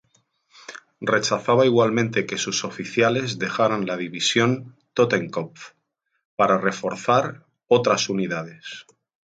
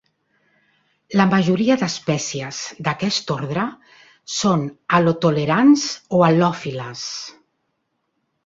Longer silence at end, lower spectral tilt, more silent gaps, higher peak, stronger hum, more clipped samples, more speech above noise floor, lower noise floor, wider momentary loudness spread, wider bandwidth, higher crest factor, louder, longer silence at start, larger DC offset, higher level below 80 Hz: second, 0.45 s vs 1.15 s; about the same, -4.5 dB/octave vs -5 dB/octave; first, 6.25-6.37 s vs none; about the same, -4 dBFS vs -2 dBFS; neither; neither; second, 44 dB vs 54 dB; second, -66 dBFS vs -72 dBFS; first, 17 LU vs 13 LU; first, 9.4 kHz vs 7.8 kHz; about the same, 20 dB vs 18 dB; second, -22 LUFS vs -19 LUFS; second, 0.7 s vs 1.1 s; neither; second, -66 dBFS vs -60 dBFS